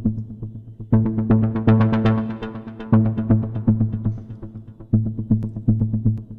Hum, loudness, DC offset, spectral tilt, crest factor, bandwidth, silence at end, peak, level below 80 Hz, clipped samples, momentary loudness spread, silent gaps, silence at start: none; -20 LUFS; under 0.1%; -11 dB/octave; 16 dB; 4.2 kHz; 0 s; -4 dBFS; -38 dBFS; under 0.1%; 17 LU; none; 0 s